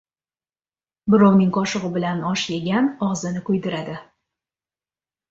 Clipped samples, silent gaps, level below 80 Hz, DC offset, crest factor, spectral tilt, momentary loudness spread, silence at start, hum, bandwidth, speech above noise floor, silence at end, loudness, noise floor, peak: under 0.1%; none; -60 dBFS; under 0.1%; 18 dB; -6 dB/octave; 14 LU; 1.05 s; none; 7.8 kHz; over 70 dB; 1.3 s; -20 LUFS; under -90 dBFS; -4 dBFS